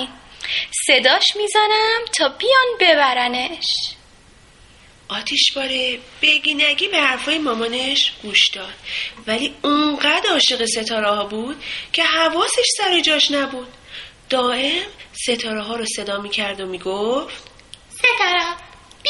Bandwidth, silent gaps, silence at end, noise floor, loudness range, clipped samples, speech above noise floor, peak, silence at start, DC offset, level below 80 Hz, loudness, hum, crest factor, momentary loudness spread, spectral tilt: 11.5 kHz; none; 0 s; -48 dBFS; 6 LU; under 0.1%; 29 dB; 0 dBFS; 0 s; under 0.1%; -54 dBFS; -17 LUFS; none; 20 dB; 13 LU; -1 dB/octave